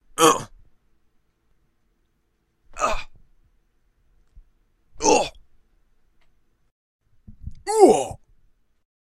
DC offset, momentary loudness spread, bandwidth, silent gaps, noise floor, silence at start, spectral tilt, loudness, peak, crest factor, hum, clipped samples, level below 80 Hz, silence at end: under 0.1%; 27 LU; 15.5 kHz; 6.72-6.99 s; -69 dBFS; 0.2 s; -3 dB/octave; -20 LUFS; 0 dBFS; 26 dB; none; under 0.1%; -46 dBFS; 0.9 s